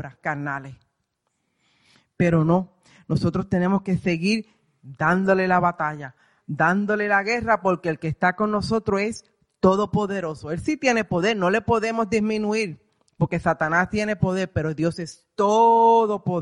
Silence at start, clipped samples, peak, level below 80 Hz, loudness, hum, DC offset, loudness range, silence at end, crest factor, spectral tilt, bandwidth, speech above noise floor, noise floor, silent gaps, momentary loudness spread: 0 s; under 0.1%; -6 dBFS; -50 dBFS; -22 LUFS; none; under 0.1%; 3 LU; 0 s; 18 dB; -6.5 dB/octave; 11 kHz; 54 dB; -75 dBFS; none; 10 LU